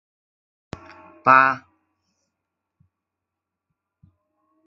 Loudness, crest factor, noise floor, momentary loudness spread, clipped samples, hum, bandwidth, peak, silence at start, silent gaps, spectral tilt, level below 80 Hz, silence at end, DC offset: -17 LUFS; 26 dB; -84 dBFS; 27 LU; under 0.1%; none; 7.4 kHz; 0 dBFS; 1.25 s; none; -6 dB/octave; -62 dBFS; 3.1 s; under 0.1%